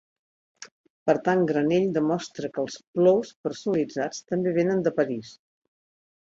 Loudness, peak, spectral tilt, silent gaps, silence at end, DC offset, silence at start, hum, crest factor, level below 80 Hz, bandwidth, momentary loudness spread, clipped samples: -25 LUFS; -8 dBFS; -6.5 dB/octave; 0.72-0.84 s, 0.90-1.06 s, 2.87-2.94 s, 3.36-3.44 s; 1 s; under 0.1%; 0.6 s; none; 18 dB; -68 dBFS; 7.8 kHz; 10 LU; under 0.1%